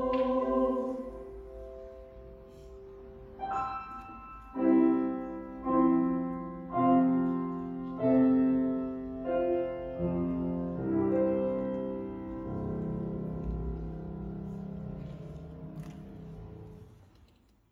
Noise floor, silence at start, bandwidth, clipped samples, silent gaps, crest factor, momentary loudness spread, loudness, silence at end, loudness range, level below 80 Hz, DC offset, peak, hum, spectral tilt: -63 dBFS; 0 s; 4.3 kHz; under 0.1%; none; 18 dB; 21 LU; -31 LUFS; 0.8 s; 13 LU; -50 dBFS; under 0.1%; -14 dBFS; none; -10 dB/octave